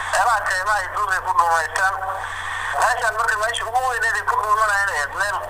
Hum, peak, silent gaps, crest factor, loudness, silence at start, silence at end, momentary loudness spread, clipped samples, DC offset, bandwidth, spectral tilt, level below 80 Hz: none; -2 dBFS; none; 18 dB; -20 LUFS; 0 s; 0 s; 6 LU; under 0.1%; under 0.1%; 16 kHz; -1 dB/octave; -46 dBFS